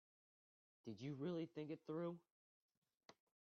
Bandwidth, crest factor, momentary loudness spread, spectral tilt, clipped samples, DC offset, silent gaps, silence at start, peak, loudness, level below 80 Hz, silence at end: 6.8 kHz; 16 dB; 12 LU; -7 dB/octave; under 0.1%; under 0.1%; 2.31-2.69 s, 2.77-2.82 s, 2.97-3.09 s; 0.85 s; -38 dBFS; -50 LUFS; under -90 dBFS; 0.4 s